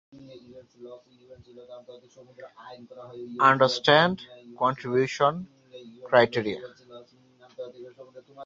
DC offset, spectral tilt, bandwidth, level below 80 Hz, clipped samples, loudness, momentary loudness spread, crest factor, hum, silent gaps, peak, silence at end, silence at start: under 0.1%; -5 dB/octave; 7.8 kHz; -66 dBFS; under 0.1%; -23 LUFS; 27 LU; 24 dB; none; none; -4 dBFS; 0 s; 0.35 s